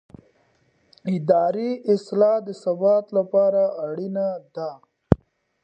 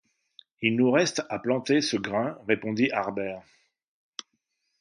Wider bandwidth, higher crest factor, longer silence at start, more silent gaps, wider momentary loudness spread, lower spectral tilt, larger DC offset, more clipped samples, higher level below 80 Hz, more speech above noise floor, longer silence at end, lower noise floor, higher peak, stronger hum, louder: second, 8.6 kHz vs 10.5 kHz; about the same, 22 dB vs 20 dB; first, 1.05 s vs 0.6 s; neither; second, 11 LU vs 20 LU; first, -9 dB/octave vs -4.5 dB/octave; neither; neither; first, -44 dBFS vs -68 dBFS; second, 42 dB vs 52 dB; second, 0.45 s vs 1.4 s; second, -64 dBFS vs -77 dBFS; first, 0 dBFS vs -8 dBFS; neither; first, -22 LUFS vs -26 LUFS